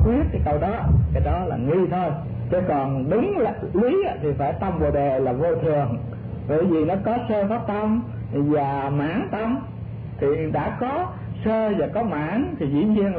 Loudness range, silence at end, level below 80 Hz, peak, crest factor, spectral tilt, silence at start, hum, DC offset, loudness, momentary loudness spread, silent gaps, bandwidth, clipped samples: 3 LU; 0 s; -34 dBFS; -8 dBFS; 14 dB; -12.5 dB/octave; 0 s; none; under 0.1%; -23 LUFS; 6 LU; none; 4.7 kHz; under 0.1%